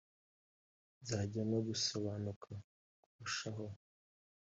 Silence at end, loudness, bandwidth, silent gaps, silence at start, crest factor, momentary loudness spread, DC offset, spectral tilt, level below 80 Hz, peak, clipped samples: 0.7 s; -41 LUFS; 8.2 kHz; 2.36-2.41 s, 2.64-3.19 s; 1 s; 18 dB; 15 LU; under 0.1%; -4.5 dB/octave; -76 dBFS; -24 dBFS; under 0.1%